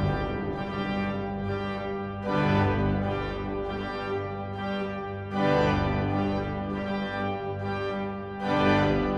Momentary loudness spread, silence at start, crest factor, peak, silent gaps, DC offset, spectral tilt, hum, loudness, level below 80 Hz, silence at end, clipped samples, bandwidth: 9 LU; 0 s; 16 dB; -12 dBFS; none; under 0.1%; -8 dB/octave; 50 Hz at -45 dBFS; -28 LUFS; -42 dBFS; 0 s; under 0.1%; 7.6 kHz